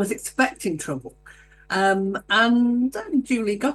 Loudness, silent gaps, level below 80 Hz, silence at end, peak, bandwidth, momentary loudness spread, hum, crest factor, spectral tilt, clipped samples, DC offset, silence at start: -22 LUFS; none; -56 dBFS; 0 s; -6 dBFS; 12.5 kHz; 10 LU; none; 16 dB; -4 dB/octave; under 0.1%; under 0.1%; 0 s